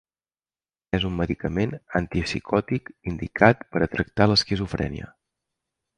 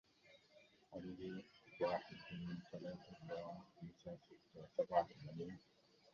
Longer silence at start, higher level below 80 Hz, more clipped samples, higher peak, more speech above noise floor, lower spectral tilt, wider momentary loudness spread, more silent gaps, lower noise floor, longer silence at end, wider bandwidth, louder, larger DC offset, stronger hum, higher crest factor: first, 0.95 s vs 0.25 s; first, -42 dBFS vs -76 dBFS; neither; first, -2 dBFS vs -24 dBFS; first, over 66 dB vs 23 dB; about the same, -6 dB/octave vs -5 dB/octave; second, 12 LU vs 21 LU; neither; first, under -90 dBFS vs -70 dBFS; first, 0.9 s vs 0.55 s; first, 10.5 kHz vs 7.2 kHz; first, -24 LUFS vs -48 LUFS; neither; neither; about the same, 24 dB vs 24 dB